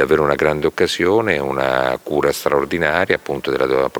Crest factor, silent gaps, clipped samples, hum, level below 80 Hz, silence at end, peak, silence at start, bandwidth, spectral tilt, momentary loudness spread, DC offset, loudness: 16 dB; none; under 0.1%; none; -44 dBFS; 0 s; 0 dBFS; 0 s; over 20 kHz; -5 dB/octave; 4 LU; under 0.1%; -17 LUFS